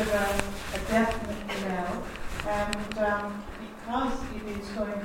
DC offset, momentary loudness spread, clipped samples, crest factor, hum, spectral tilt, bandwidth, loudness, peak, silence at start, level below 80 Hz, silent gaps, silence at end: under 0.1%; 10 LU; under 0.1%; 24 dB; none; -4.5 dB/octave; 16.5 kHz; -31 LUFS; -6 dBFS; 0 s; -42 dBFS; none; 0 s